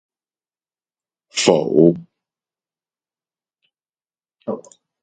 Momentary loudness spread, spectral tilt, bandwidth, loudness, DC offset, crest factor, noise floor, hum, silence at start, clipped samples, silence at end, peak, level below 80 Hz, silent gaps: 17 LU; -5 dB/octave; 9.4 kHz; -16 LUFS; under 0.1%; 22 dB; under -90 dBFS; none; 1.35 s; under 0.1%; 0.4 s; 0 dBFS; -64 dBFS; none